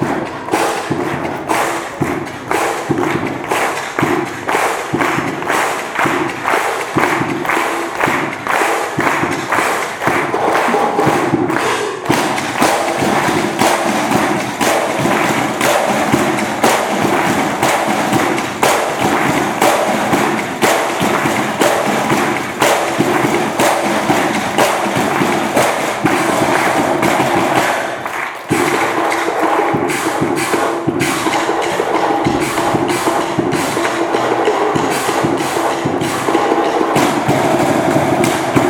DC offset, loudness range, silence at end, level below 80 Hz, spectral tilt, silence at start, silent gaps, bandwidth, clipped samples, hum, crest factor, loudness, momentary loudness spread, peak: under 0.1%; 2 LU; 0 s; -48 dBFS; -4 dB/octave; 0 s; none; 19 kHz; under 0.1%; none; 14 dB; -15 LUFS; 4 LU; 0 dBFS